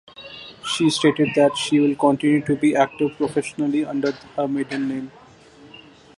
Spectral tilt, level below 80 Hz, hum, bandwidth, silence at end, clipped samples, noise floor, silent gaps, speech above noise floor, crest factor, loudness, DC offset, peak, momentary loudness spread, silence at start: -5 dB/octave; -60 dBFS; none; 11.5 kHz; 0.4 s; under 0.1%; -47 dBFS; none; 27 dB; 18 dB; -20 LUFS; under 0.1%; -4 dBFS; 14 LU; 0.2 s